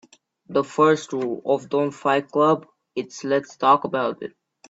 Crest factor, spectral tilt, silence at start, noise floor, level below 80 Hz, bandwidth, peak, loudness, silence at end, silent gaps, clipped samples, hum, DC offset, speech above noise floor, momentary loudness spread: 18 dB; -5.5 dB/octave; 0.5 s; -46 dBFS; -70 dBFS; 8 kHz; -4 dBFS; -22 LUFS; 0.4 s; none; under 0.1%; none; under 0.1%; 25 dB; 13 LU